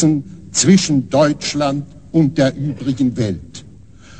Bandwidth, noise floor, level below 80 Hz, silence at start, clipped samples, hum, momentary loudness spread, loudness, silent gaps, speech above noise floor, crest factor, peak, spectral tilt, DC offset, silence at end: 9.2 kHz; -41 dBFS; -46 dBFS; 0 s; under 0.1%; none; 12 LU; -16 LUFS; none; 26 dB; 16 dB; 0 dBFS; -5 dB/octave; 0.5%; 0.05 s